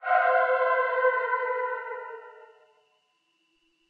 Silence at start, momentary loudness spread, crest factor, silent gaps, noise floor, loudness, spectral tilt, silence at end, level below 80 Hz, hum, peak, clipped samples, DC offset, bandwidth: 0 s; 16 LU; 18 dB; none; -72 dBFS; -25 LUFS; -0.5 dB/octave; 1.45 s; under -90 dBFS; none; -10 dBFS; under 0.1%; under 0.1%; 5 kHz